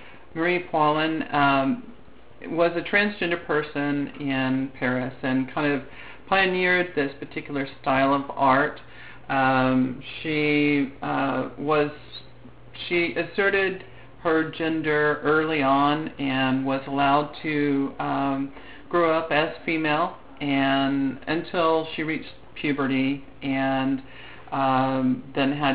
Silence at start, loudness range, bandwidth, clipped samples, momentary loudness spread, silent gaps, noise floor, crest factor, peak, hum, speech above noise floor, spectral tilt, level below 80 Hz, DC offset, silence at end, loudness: 0 s; 3 LU; 5 kHz; under 0.1%; 11 LU; none; -50 dBFS; 18 dB; -6 dBFS; none; 26 dB; -10 dB/octave; -56 dBFS; 0.6%; 0 s; -24 LUFS